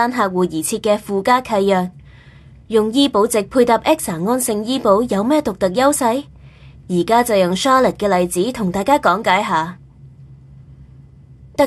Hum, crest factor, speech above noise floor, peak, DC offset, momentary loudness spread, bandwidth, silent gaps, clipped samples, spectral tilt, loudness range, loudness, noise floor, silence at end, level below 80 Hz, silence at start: none; 16 dB; 27 dB; -2 dBFS; under 0.1%; 5 LU; 13 kHz; none; under 0.1%; -4.5 dB/octave; 2 LU; -16 LUFS; -42 dBFS; 0 s; -46 dBFS; 0 s